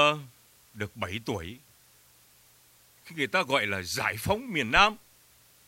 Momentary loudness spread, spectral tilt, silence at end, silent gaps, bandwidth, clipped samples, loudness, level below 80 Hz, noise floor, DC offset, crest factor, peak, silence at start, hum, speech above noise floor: 17 LU; -3.5 dB/octave; 0.7 s; none; 16 kHz; under 0.1%; -27 LUFS; -50 dBFS; -60 dBFS; under 0.1%; 26 dB; -4 dBFS; 0 s; none; 31 dB